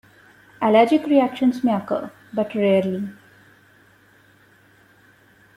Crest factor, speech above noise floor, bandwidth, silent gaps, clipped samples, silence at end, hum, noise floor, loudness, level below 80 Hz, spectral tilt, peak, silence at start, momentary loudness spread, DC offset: 20 dB; 36 dB; 15 kHz; none; under 0.1%; 2.45 s; none; -54 dBFS; -20 LUFS; -66 dBFS; -7.5 dB/octave; -2 dBFS; 0.6 s; 12 LU; under 0.1%